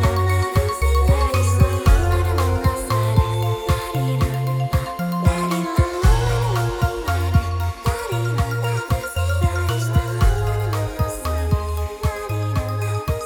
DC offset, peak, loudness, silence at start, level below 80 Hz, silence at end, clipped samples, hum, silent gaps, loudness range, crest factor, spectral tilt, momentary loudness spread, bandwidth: under 0.1%; -4 dBFS; -21 LUFS; 0 s; -24 dBFS; 0 s; under 0.1%; none; none; 3 LU; 16 dB; -6 dB/octave; 6 LU; 19 kHz